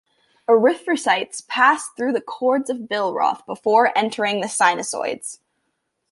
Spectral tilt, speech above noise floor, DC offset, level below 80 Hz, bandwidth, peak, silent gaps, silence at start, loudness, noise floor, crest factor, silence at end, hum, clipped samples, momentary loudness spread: -2.5 dB/octave; 54 dB; under 0.1%; -74 dBFS; 11.5 kHz; -2 dBFS; none; 0.5 s; -20 LUFS; -74 dBFS; 18 dB; 0.75 s; none; under 0.1%; 9 LU